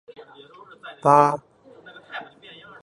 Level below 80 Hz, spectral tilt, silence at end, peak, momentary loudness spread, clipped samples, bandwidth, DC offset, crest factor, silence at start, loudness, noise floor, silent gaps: -70 dBFS; -6.5 dB/octave; 0.6 s; -2 dBFS; 26 LU; under 0.1%; 11 kHz; under 0.1%; 24 dB; 0.85 s; -19 LUFS; -47 dBFS; none